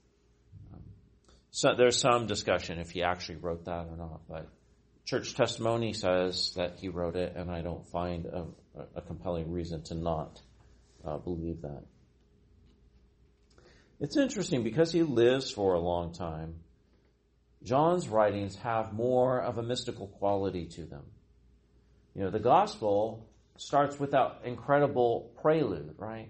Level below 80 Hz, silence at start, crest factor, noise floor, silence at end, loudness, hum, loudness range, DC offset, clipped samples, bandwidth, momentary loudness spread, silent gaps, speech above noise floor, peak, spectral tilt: -56 dBFS; 0.55 s; 22 dB; -68 dBFS; 0 s; -31 LUFS; none; 9 LU; under 0.1%; under 0.1%; 8.4 kHz; 18 LU; none; 37 dB; -10 dBFS; -5 dB/octave